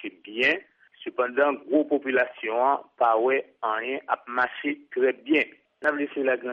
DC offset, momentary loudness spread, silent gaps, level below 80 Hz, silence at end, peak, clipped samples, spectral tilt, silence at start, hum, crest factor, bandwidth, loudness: under 0.1%; 7 LU; none; -78 dBFS; 0 s; -10 dBFS; under 0.1%; -5.5 dB/octave; 0 s; none; 16 dB; 7.2 kHz; -25 LUFS